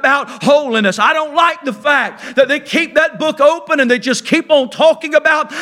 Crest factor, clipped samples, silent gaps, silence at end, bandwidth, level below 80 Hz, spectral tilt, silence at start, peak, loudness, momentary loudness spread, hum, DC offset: 14 dB; under 0.1%; none; 0 s; 14 kHz; -62 dBFS; -3.5 dB/octave; 0 s; 0 dBFS; -13 LUFS; 3 LU; none; under 0.1%